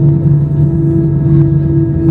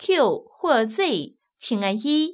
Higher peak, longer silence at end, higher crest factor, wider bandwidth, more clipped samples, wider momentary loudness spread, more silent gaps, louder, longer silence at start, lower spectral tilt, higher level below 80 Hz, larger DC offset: first, 0 dBFS vs -6 dBFS; about the same, 0 s vs 0 s; second, 10 dB vs 16 dB; second, 2 kHz vs 4 kHz; neither; second, 2 LU vs 10 LU; neither; first, -11 LUFS vs -23 LUFS; about the same, 0 s vs 0 s; first, -13 dB/octave vs -9 dB/octave; first, -28 dBFS vs -76 dBFS; neither